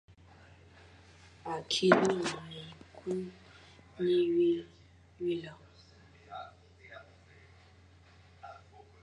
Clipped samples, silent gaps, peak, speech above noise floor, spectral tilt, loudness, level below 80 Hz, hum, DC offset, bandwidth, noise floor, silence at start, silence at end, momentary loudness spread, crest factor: under 0.1%; none; -8 dBFS; 29 dB; -5 dB/octave; -31 LUFS; -66 dBFS; none; under 0.1%; 11 kHz; -59 dBFS; 1.45 s; 0.45 s; 27 LU; 28 dB